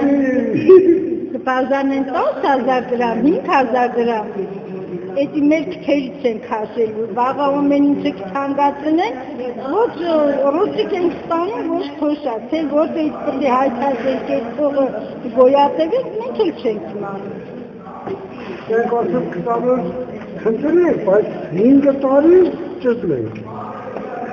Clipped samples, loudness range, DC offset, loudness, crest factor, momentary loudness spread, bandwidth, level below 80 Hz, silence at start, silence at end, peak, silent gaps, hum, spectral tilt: under 0.1%; 6 LU; under 0.1%; -17 LUFS; 16 dB; 14 LU; 6.8 kHz; -54 dBFS; 0 s; 0 s; 0 dBFS; none; none; -7.5 dB/octave